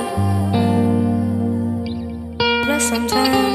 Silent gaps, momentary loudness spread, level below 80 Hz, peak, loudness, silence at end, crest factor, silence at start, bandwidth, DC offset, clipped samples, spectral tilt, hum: none; 8 LU; -42 dBFS; -2 dBFS; -18 LUFS; 0 s; 16 dB; 0 s; 15 kHz; under 0.1%; under 0.1%; -5 dB/octave; none